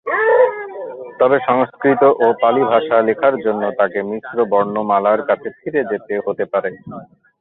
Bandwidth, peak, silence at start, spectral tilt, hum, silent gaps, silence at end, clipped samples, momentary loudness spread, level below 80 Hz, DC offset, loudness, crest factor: 4.1 kHz; 0 dBFS; 0.05 s; -9.5 dB/octave; none; none; 0.35 s; under 0.1%; 14 LU; -62 dBFS; under 0.1%; -16 LUFS; 16 dB